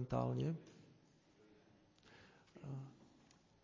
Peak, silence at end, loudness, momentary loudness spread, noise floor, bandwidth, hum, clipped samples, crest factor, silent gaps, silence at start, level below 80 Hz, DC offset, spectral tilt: -26 dBFS; 0.65 s; -44 LUFS; 26 LU; -70 dBFS; 7.4 kHz; none; under 0.1%; 22 dB; none; 0 s; -70 dBFS; under 0.1%; -8.5 dB/octave